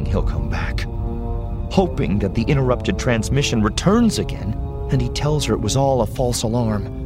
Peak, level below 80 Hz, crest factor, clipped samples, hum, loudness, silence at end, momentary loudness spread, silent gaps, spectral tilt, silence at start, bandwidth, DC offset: -2 dBFS; -28 dBFS; 18 dB; under 0.1%; none; -20 LUFS; 0 s; 9 LU; none; -6 dB/octave; 0 s; 16 kHz; under 0.1%